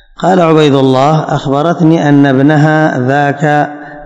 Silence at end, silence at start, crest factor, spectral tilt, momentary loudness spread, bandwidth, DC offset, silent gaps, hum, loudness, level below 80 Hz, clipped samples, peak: 0 s; 0.2 s; 8 dB; -7.5 dB/octave; 5 LU; 8.2 kHz; under 0.1%; none; none; -9 LUFS; -46 dBFS; 3%; 0 dBFS